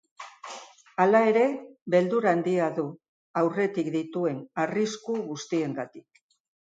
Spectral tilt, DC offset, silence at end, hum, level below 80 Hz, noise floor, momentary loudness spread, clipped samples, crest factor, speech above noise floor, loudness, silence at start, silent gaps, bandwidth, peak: -6 dB/octave; under 0.1%; 0.7 s; none; -78 dBFS; -45 dBFS; 19 LU; under 0.1%; 18 dB; 20 dB; -26 LUFS; 0.2 s; 1.82-1.86 s, 3.08-3.34 s; 9.2 kHz; -8 dBFS